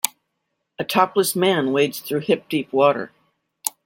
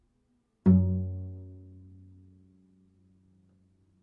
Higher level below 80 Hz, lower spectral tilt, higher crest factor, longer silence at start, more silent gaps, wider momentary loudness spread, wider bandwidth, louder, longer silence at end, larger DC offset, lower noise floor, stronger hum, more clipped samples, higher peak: about the same, -68 dBFS vs -66 dBFS; second, -4 dB/octave vs -13.5 dB/octave; about the same, 22 dB vs 22 dB; second, 0.05 s vs 0.65 s; neither; second, 10 LU vs 27 LU; first, 17 kHz vs 2.1 kHz; first, -21 LUFS vs -27 LUFS; second, 0.15 s vs 2.45 s; neither; first, -76 dBFS vs -72 dBFS; neither; neither; first, 0 dBFS vs -10 dBFS